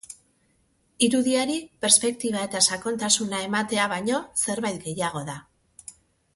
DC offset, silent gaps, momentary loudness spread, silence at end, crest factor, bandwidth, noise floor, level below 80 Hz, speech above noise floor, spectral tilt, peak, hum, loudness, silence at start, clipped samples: under 0.1%; none; 22 LU; 0.45 s; 24 dB; 12 kHz; -67 dBFS; -64 dBFS; 42 dB; -2 dB/octave; -2 dBFS; none; -23 LUFS; 0.1 s; under 0.1%